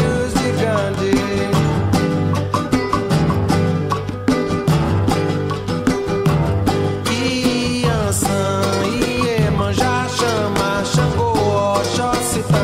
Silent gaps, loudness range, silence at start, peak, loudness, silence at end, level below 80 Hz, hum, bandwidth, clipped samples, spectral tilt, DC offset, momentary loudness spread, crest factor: none; 1 LU; 0 s; -2 dBFS; -18 LUFS; 0 s; -34 dBFS; none; 16 kHz; under 0.1%; -5.5 dB/octave; under 0.1%; 2 LU; 16 dB